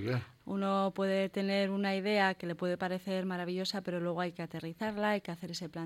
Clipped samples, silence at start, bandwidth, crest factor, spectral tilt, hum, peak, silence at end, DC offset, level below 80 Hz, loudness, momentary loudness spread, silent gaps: under 0.1%; 0 s; 14.5 kHz; 18 dB; -6 dB/octave; none; -16 dBFS; 0 s; under 0.1%; -72 dBFS; -34 LUFS; 9 LU; none